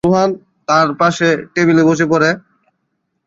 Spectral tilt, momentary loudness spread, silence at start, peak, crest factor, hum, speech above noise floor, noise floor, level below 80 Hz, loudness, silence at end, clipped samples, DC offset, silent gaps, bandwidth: -5.5 dB/octave; 6 LU; 0.05 s; 0 dBFS; 14 dB; none; 57 dB; -69 dBFS; -52 dBFS; -13 LUFS; 0.9 s; under 0.1%; under 0.1%; none; 7.8 kHz